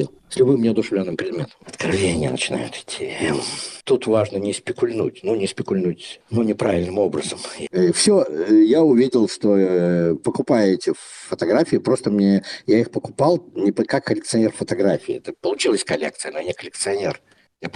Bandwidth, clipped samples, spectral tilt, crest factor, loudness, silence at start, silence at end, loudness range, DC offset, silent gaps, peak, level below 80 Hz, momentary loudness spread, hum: 11.5 kHz; under 0.1%; -5 dB/octave; 16 dB; -20 LUFS; 0 s; 0.05 s; 5 LU; under 0.1%; none; -4 dBFS; -56 dBFS; 11 LU; none